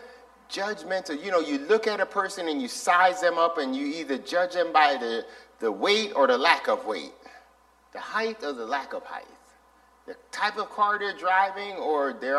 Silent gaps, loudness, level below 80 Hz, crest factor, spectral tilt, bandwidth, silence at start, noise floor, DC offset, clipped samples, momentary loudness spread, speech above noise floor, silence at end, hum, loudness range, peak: none; -26 LUFS; -70 dBFS; 24 dB; -2.5 dB/octave; 13.5 kHz; 0 s; -60 dBFS; under 0.1%; under 0.1%; 15 LU; 34 dB; 0 s; none; 8 LU; -2 dBFS